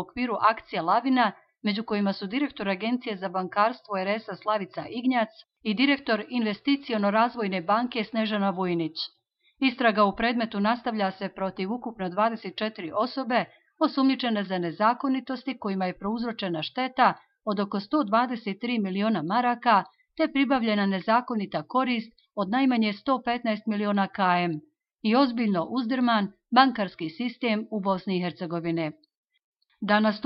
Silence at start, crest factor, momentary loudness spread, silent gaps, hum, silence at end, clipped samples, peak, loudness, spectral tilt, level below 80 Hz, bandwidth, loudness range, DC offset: 0 s; 22 dB; 9 LU; 29.17-29.24 s, 29.44-29.53 s; none; 0.05 s; under 0.1%; -6 dBFS; -26 LUFS; -9 dB/octave; -64 dBFS; 5.8 kHz; 3 LU; under 0.1%